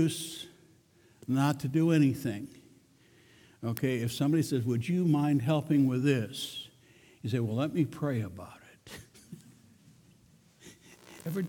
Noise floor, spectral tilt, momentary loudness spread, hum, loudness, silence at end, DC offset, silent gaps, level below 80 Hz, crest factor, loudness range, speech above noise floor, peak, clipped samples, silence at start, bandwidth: -63 dBFS; -6.5 dB/octave; 22 LU; none; -30 LUFS; 0 s; under 0.1%; none; -68 dBFS; 18 dB; 8 LU; 34 dB; -14 dBFS; under 0.1%; 0 s; 19 kHz